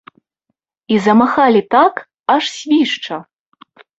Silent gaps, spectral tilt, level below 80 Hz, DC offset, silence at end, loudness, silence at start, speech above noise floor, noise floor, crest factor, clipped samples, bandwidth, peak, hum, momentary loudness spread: 2.20-2.24 s; -5 dB/octave; -60 dBFS; under 0.1%; 0.75 s; -14 LUFS; 0.9 s; 60 dB; -73 dBFS; 16 dB; under 0.1%; 8 kHz; 0 dBFS; none; 11 LU